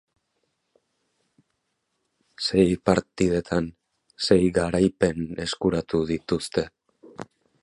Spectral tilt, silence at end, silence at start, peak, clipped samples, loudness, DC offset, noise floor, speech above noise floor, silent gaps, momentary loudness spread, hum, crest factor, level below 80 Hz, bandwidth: -5.5 dB/octave; 0.4 s; 2.4 s; -4 dBFS; under 0.1%; -24 LUFS; under 0.1%; -76 dBFS; 53 dB; none; 15 LU; none; 22 dB; -48 dBFS; 11.5 kHz